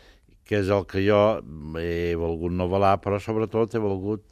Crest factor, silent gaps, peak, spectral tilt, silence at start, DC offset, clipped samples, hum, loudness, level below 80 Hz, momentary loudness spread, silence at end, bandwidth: 18 dB; none; -6 dBFS; -7.5 dB/octave; 0.5 s; under 0.1%; under 0.1%; none; -24 LUFS; -50 dBFS; 9 LU; 0.1 s; 14 kHz